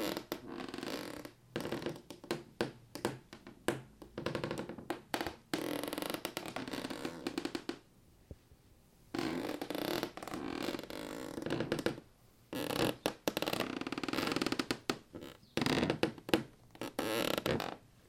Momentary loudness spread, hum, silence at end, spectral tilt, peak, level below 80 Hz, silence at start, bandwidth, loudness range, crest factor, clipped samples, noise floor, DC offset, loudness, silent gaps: 12 LU; none; 0 s; -4.5 dB/octave; -10 dBFS; -64 dBFS; 0 s; 16.5 kHz; 6 LU; 30 dB; under 0.1%; -64 dBFS; under 0.1%; -39 LUFS; none